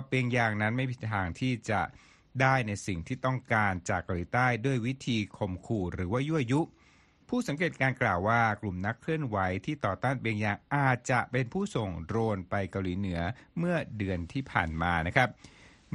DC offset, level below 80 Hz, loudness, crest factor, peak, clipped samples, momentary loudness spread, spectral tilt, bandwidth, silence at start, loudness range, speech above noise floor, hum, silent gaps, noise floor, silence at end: under 0.1%; -54 dBFS; -30 LUFS; 24 dB; -8 dBFS; under 0.1%; 7 LU; -6.5 dB/octave; 11.5 kHz; 0 s; 2 LU; 32 dB; none; none; -62 dBFS; 0 s